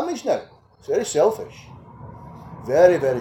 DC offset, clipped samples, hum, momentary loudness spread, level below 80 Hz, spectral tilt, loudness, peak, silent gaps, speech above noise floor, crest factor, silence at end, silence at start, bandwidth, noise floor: under 0.1%; under 0.1%; none; 25 LU; -54 dBFS; -5 dB/octave; -20 LUFS; -2 dBFS; none; 21 dB; 20 dB; 0 s; 0 s; 17 kHz; -40 dBFS